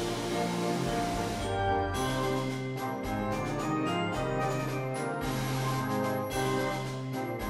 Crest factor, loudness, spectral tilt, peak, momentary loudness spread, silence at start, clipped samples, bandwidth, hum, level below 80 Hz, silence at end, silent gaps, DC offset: 14 dB; -32 LUFS; -5.5 dB/octave; -18 dBFS; 4 LU; 0 s; under 0.1%; 16 kHz; none; -48 dBFS; 0 s; none; under 0.1%